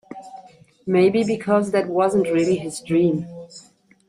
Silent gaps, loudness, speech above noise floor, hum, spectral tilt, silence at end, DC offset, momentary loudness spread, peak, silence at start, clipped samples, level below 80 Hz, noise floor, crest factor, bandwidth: none; -20 LUFS; 28 dB; none; -6.5 dB/octave; 0.5 s; under 0.1%; 20 LU; -6 dBFS; 0.1 s; under 0.1%; -60 dBFS; -47 dBFS; 16 dB; 11.5 kHz